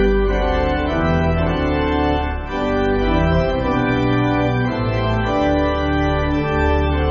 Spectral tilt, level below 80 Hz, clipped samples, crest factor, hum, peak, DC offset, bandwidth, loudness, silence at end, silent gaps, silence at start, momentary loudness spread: -5.5 dB/octave; -24 dBFS; under 0.1%; 12 dB; none; -4 dBFS; under 0.1%; 7 kHz; -18 LUFS; 0 s; none; 0 s; 2 LU